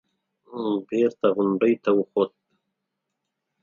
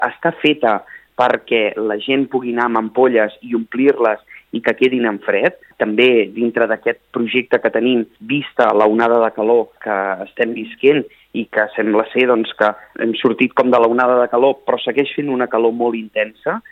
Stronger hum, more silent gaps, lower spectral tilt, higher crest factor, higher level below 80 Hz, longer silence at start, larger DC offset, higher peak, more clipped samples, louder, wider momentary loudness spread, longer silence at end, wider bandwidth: neither; neither; about the same, -8 dB/octave vs -7 dB/octave; about the same, 18 dB vs 16 dB; second, -76 dBFS vs -66 dBFS; first, 0.5 s vs 0 s; neither; second, -8 dBFS vs 0 dBFS; neither; second, -23 LUFS vs -16 LUFS; about the same, 7 LU vs 8 LU; first, 1.35 s vs 0.1 s; about the same, 7 kHz vs 6.4 kHz